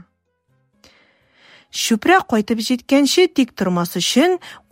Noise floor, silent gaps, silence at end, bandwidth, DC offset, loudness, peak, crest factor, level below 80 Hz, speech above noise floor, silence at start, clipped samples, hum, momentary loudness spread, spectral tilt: -66 dBFS; none; 0.15 s; 16.5 kHz; under 0.1%; -17 LUFS; -2 dBFS; 18 dB; -58 dBFS; 49 dB; 1.75 s; under 0.1%; none; 6 LU; -4 dB/octave